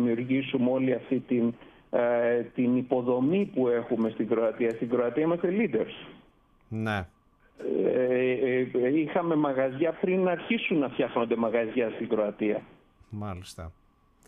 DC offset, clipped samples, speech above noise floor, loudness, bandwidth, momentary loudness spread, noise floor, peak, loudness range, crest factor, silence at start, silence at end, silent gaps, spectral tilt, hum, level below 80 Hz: under 0.1%; under 0.1%; 34 dB; -27 LUFS; 11 kHz; 12 LU; -61 dBFS; -12 dBFS; 3 LU; 16 dB; 0 s; 0.55 s; none; -8 dB/octave; none; -62 dBFS